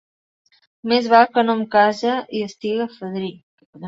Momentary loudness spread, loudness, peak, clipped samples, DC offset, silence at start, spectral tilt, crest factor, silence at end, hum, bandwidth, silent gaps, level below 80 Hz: 14 LU; -19 LUFS; 0 dBFS; under 0.1%; under 0.1%; 0.85 s; -5.5 dB/octave; 20 dB; 0 s; none; 7.8 kHz; 3.43-3.58 s, 3.66-3.73 s; -68 dBFS